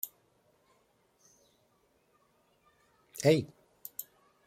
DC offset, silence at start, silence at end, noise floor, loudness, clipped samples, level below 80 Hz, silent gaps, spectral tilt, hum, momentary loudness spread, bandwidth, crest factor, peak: under 0.1%; 0.05 s; 0.45 s; -71 dBFS; -32 LUFS; under 0.1%; -76 dBFS; none; -5.5 dB/octave; none; 22 LU; 16.5 kHz; 26 dB; -12 dBFS